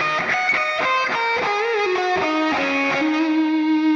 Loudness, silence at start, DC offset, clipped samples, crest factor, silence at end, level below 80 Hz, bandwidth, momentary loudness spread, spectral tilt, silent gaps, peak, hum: -19 LUFS; 0 s; under 0.1%; under 0.1%; 10 dB; 0 s; -60 dBFS; 7.4 kHz; 2 LU; -4 dB/octave; none; -8 dBFS; none